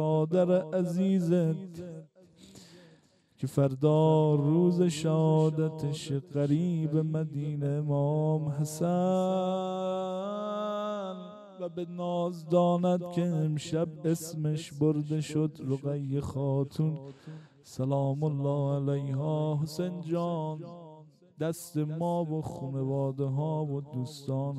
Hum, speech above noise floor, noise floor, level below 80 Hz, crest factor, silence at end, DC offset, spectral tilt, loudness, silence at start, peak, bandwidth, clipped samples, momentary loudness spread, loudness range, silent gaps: none; 34 dB; -63 dBFS; -68 dBFS; 16 dB; 0 s; under 0.1%; -8 dB/octave; -30 LUFS; 0 s; -14 dBFS; 13 kHz; under 0.1%; 12 LU; 6 LU; none